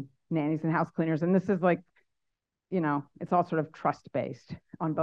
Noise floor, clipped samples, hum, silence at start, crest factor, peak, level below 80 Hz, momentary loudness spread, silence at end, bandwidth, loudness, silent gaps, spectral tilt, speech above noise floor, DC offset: -84 dBFS; under 0.1%; none; 0 s; 18 dB; -12 dBFS; -72 dBFS; 8 LU; 0 s; 7 kHz; -30 LUFS; none; -9.5 dB/octave; 55 dB; under 0.1%